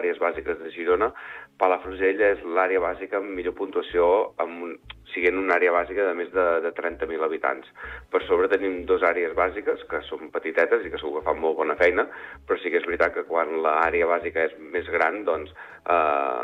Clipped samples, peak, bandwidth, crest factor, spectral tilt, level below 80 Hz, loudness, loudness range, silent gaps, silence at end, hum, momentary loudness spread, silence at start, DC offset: under 0.1%; -8 dBFS; 6 kHz; 16 dB; -6.5 dB/octave; -52 dBFS; -24 LUFS; 1 LU; none; 0 s; none; 10 LU; 0 s; under 0.1%